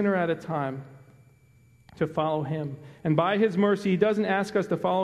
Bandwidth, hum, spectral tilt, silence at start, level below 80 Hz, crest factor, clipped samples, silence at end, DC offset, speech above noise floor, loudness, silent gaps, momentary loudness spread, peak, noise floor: 12 kHz; none; -7.5 dB/octave; 0 s; -64 dBFS; 20 dB; under 0.1%; 0 s; under 0.1%; 33 dB; -26 LUFS; none; 10 LU; -6 dBFS; -58 dBFS